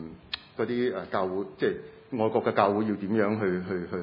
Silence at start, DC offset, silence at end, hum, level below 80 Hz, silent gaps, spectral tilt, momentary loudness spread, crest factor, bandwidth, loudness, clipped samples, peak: 0 s; under 0.1%; 0 s; none; -66 dBFS; none; -9.5 dB/octave; 12 LU; 22 dB; 5.6 kHz; -28 LUFS; under 0.1%; -6 dBFS